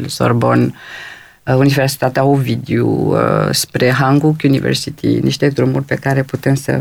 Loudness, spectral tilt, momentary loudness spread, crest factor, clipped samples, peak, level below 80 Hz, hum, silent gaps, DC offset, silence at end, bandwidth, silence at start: -14 LUFS; -6 dB/octave; 5 LU; 14 dB; under 0.1%; 0 dBFS; -46 dBFS; none; none; under 0.1%; 0 s; 17 kHz; 0 s